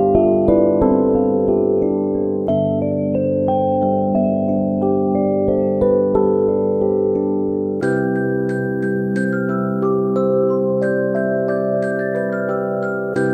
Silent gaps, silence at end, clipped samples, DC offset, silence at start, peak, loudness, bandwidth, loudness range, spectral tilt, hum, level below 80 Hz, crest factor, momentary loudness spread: none; 0 s; under 0.1%; under 0.1%; 0 s; -2 dBFS; -18 LUFS; 8.8 kHz; 2 LU; -10 dB/octave; none; -44 dBFS; 16 dB; 5 LU